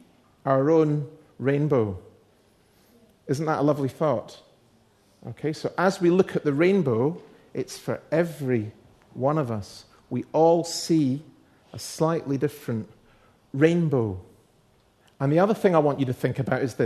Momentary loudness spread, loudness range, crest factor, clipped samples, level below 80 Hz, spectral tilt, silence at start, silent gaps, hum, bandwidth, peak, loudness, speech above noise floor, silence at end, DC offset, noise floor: 17 LU; 4 LU; 20 dB; under 0.1%; -64 dBFS; -7 dB/octave; 0.45 s; none; none; 13.5 kHz; -4 dBFS; -24 LUFS; 38 dB; 0 s; under 0.1%; -61 dBFS